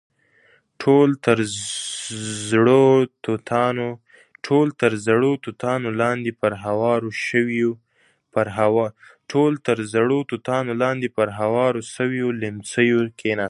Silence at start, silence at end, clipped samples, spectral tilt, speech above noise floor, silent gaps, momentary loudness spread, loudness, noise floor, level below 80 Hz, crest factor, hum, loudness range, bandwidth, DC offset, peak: 0.8 s; 0 s; under 0.1%; -5.5 dB/octave; 42 dB; none; 11 LU; -21 LUFS; -62 dBFS; -60 dBFS; 20 dB; none; 3 LU; 11.5 kHz; under 0.1%; -2 dBFS